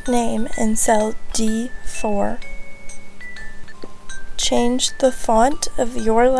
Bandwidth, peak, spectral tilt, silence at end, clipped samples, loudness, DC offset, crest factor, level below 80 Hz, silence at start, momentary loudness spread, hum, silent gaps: 11 kHz; -4 dBFS; -3 dB/octave; 0 s; under 0.1%; -20 LUFS; under 0.1%; 14 dB; -32 dBFS; 0 s; 22 LU; none; none